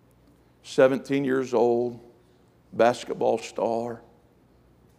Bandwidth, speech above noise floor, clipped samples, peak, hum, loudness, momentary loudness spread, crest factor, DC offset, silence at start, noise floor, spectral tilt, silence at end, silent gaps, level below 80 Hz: 13 kHz; 35 dB; under 0.1%; -6 dBFS; none; -25 LUFS; 14 LU; 20 dB; under 0.1%; 0.65 s; -59 dBFS; -5.5 dB/octave; 1 s; none; -66 dBFS